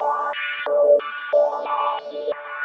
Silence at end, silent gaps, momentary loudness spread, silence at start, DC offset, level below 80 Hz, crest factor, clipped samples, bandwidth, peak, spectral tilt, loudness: 0 s; none; 11 LU; 0 s; under 0.1%; -80 dBFS; 16 dB; under 0.1%; 5.6 kHz; -6 dBFS; -2.5 dB/octave; -21 LUFS